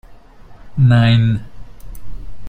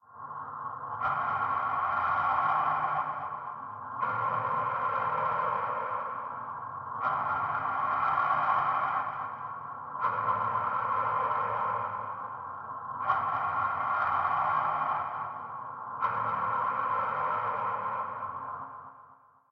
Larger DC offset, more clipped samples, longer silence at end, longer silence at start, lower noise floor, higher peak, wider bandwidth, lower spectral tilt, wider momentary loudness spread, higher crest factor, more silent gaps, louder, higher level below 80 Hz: neither; neither; second, 0 s vs 0.35 s; about the same, 0.1 s vs 0.1 s; second, -39 dBFS vs -58 dBFS; first, -2 dBFS vs -14 dBFS; second, 4.4 kHz vs 5.8 kHz; about the same, -8 dB/octave vs -7 dB/octave; first, 17 LU vs 12 LU; about the same, 14 dB vs 16 dB; neither; first, -14 LUFS vs -31 LUFS; first, -36 dBFS vs -68 dBFS